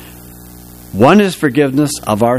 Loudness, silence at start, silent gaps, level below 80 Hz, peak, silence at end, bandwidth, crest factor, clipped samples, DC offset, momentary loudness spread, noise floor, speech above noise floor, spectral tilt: -12 LUFS; 0 s; none; -42 dBFS; 0 dBFS; 0 s; 16 kHz; 14 dB; 0.2%; under 0.1%; 7 LU; -35 dBFS; 24 dB; -5.5 dB/octave